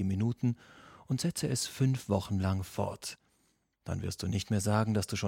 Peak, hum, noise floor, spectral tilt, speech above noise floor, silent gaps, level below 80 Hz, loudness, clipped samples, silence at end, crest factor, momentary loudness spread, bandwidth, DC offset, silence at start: -14 dBFS; none; -74 dBFS; -5.5 dB/octave; 42 dB; none; -58 dBFS; -33 LUFS; under 0.1%; 0 s; 20 dB; 12 LU; 16.5 kHz; under 0.1%; 0 s